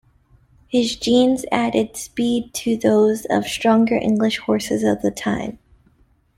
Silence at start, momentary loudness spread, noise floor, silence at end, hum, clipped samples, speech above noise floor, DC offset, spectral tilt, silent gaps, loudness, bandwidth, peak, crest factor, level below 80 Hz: 0.7 s; 7 LU; -58 dBFS; 0.85 s; none; under 0.1%; 39 dB; under 0.1%; -4.5 dB/octave; none; -19 LUFS; 15.5 kHz; -2 dBFS; 18 dB; -52 dBFS